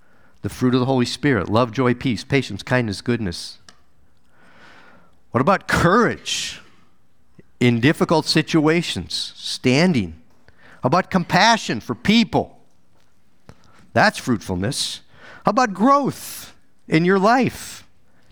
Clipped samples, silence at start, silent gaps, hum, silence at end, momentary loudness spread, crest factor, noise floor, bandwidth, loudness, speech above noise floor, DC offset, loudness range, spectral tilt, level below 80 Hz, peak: under 0.1%; 0.45 s; none; none; 0.55 s; 14 LU; 20 dB; -62 dBFS; over 20 kHz; -19 LUFS; 43 dB; 0.4%; 4 LU; -5 dB/octave; -48 dBFS; 0 dBFS